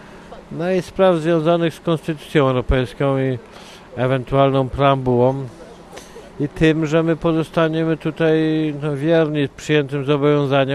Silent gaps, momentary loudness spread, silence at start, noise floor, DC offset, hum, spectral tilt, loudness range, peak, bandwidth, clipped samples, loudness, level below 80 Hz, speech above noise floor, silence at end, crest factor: none; 17 LU; 0 s; -38 dBFS; under 0.1%; none; -7.5 dB/octave; 2 LU; -2 dBFS; 12.5 kHz; under 0.1%; -18 LUFS; -38 dBFS; 21 dB; 0 s; 16 dB